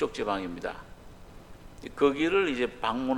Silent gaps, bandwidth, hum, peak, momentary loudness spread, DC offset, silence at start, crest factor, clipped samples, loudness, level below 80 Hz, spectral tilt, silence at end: none; 12 kHz; none; -10 dBFS; 18 LU; under 0.1%; 0 s; 20 dB; under 0.1%; -28 LUFS; -52 dBFS; -5 dB/octave; 0 s